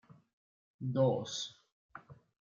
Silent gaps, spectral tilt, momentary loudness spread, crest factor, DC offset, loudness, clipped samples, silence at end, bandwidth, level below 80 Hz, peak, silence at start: 1.72-1.89 s; -6 dB/octave; 24 LU; 22 dB; under 0.1%; -35 LUFS; under 0.1%; 0.4 s; 7.6 kHz; -78 dBFS; -18 dBFS; 0.8 s